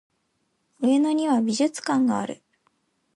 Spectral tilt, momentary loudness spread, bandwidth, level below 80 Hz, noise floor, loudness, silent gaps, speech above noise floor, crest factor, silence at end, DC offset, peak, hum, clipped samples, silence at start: -4.5 dB/octave; 9 LU; 11.5 kHz; -72 dBFS; -72 dBFS; -23 LUFS; none; 50 dB; 14 dB; 0.8 s; under 0.1%; -10 dBFS; none; under 0.1%; 0.8 s